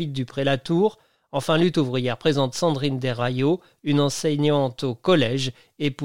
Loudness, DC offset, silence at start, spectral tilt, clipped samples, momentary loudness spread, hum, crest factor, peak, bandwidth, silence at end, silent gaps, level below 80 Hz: -23 LUFS; 0.5%; 0 s; -6 dB/octave; under 0.1%; 7 LU; none; 14 dB; -8 dBFS; 16 kHz; 0 s; none; -56 dBFS